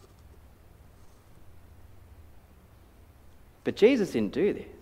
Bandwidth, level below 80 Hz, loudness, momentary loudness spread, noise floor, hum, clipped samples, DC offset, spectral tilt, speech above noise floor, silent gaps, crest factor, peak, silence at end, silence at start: 15 kHz; -56 dBFS; -26 LUFS; 12 LU; -55 dBFS; none; under 0.1%; under 0.1%; -6 dB/octave; 29 dB; none; 24 dB; -8 dBFS; 0.1 s; 1.05 s